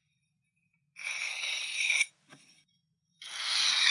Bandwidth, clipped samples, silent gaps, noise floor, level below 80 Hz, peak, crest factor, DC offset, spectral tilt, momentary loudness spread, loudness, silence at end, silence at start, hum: 12 kHz; under 0.1%; none; -79 dBFS; under -90 dBFS; -10 dBFS; 24 dB; under 0.1%; 4 dB/octave; 15 LU; -29 LUFS; 0 s; 0.95 s; none